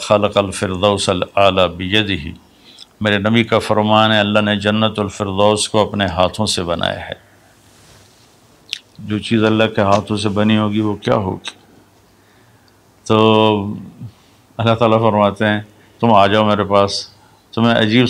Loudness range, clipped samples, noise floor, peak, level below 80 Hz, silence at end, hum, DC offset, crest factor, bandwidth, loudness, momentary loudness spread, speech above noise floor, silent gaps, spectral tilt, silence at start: 5 LU; under 0.1%; -50 dBFS; 0 dBFS; -48 dBFS; 0 s; none; under 0.1%; 16 dB; 13.5 kHz; -15 LUFS; 15 LU; 36 dB; none; -5 dB/octave; 0 s